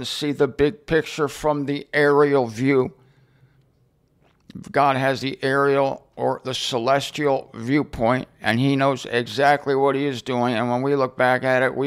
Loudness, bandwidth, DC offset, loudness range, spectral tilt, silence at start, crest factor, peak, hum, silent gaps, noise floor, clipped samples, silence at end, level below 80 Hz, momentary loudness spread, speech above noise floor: -21 LUFS; 14.5 kHz; under 0.1%; 3 LU; -5.5 dB/octave; 0 s; 16 dB; -6 dBFS; none; none; -62 dBFS; under 0.1%; 0 s; -52 dBFS; 7 LU; 41 dB